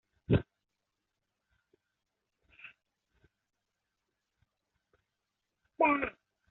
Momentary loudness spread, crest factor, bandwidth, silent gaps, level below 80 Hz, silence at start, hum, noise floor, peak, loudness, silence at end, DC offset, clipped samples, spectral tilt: 25 LU; 24 dB; 4.1 kHz; none; -58 dBFS; 0.3 s; none; -86 dBFS; -14 dBFS; -31 LUFS; 0.4 s; under 0.1%; under 0.1%; -6 dB/octave